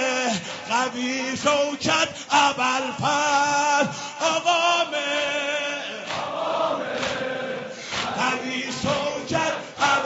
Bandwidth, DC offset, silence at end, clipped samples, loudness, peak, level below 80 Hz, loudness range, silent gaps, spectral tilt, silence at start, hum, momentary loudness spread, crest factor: 8 kHz; under 0.1%; 0 s; under 0.1%; -23 LUFS; -6 dBFS; -62 dBFS; 5 LU; none; -1 dB/octave; 0 s; none; 8 LU; 18 dB